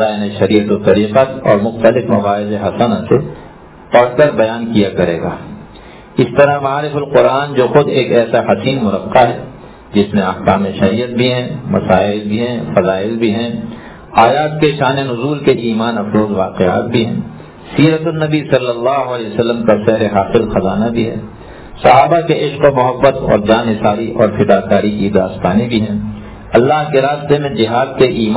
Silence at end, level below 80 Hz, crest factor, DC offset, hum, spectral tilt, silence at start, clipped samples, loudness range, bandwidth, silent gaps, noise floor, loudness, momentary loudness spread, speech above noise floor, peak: 0 s; -38 dBFS; 12 dB; under 0.1%; none; -11 dB/octave; 0 s; 0.3%; 2 LU; 4 kHz; none; -35 dBFS; -13 LUFS; 8 LU; 23 dB; 0 dBFS